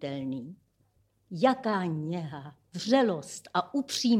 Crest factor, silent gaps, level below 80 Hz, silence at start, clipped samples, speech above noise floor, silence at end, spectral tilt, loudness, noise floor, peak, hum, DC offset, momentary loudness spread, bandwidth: 20 dB; none; -74 dBFS; 0 s; under 0.1%; 41 dB; 0 s; -5 dB/octave; -30 LUFS; -70 dBFS; -10 dBFS; none; under 0.1%; 17 LU; 15.5 kHz